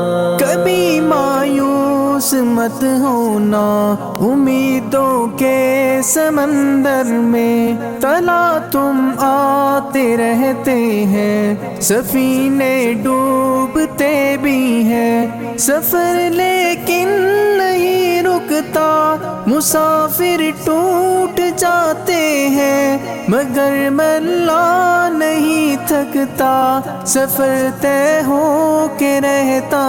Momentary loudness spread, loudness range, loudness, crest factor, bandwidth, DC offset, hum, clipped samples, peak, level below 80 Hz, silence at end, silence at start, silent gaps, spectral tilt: 3 LU; 1 LU; -14 LUFS; 10 dB; 17 kHz; under 0.1%; none; under 0.1%; -2 dBFS; -50 dBFS; 0 s; 0 s; none; -4.5 dB/octave